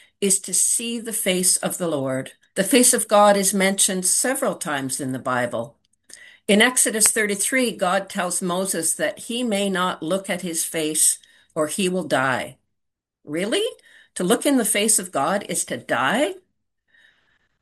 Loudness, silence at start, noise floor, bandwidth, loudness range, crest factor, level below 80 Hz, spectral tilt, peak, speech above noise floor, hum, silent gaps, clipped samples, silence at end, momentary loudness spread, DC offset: -20 LUFS; 0.2 s; -80 dBFS; 13 kHz; 5 LU; 22 dB; -68 dBFS; -2.5 dB/octave; 0 dBFS; 59 dB; none; none; under 0.1%; 1.25 s; 11 LU; under 0.1%